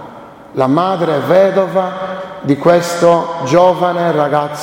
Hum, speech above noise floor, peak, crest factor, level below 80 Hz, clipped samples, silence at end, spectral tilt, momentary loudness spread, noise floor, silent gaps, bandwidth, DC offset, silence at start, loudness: none; 22 dB; 0 dBFS; 12 dB; -54 dBFS; under 0.1%; 0 s; -6 dB/octave; 11 LU; -34 dBFS; none; 16.5 kHz; under 0.1%; 0 s; -13 LUFS